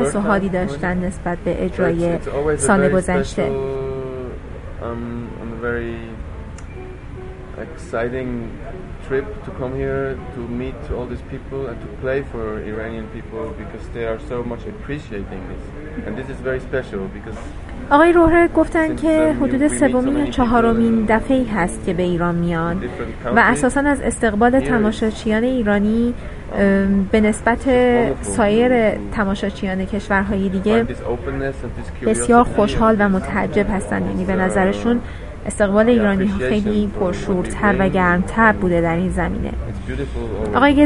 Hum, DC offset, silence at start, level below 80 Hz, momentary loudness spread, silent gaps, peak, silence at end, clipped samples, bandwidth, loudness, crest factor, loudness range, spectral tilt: none; 0.3%; 0 s; -32 dBFS; 16 LU; none; 0 dBFS; 0 s; under 0.1%; 11.5 kHz; -18 LUFS; 18 dB; 11 LU; -6 dB/octave